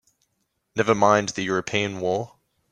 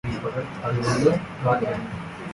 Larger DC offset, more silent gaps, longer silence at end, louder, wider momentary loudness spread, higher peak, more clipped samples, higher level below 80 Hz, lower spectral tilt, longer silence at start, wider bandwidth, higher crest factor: neither; neither; first, 0.45 s vs 0 s; about the same, -23 LUFS vs -25 LUFS; about the same, 11 LU vs 10 LU; first, -4 dBFS vs -8 dBFS; neither; second, -62 dBFS vs -48 dBFS; second, -4.5 dB/octave vs -6.5 dB/octave; first, 0.75 s vs 0.05 s; about the same, 10.5 kHz vs 11.5 kHz; about the same, 22 dB vs 18 dB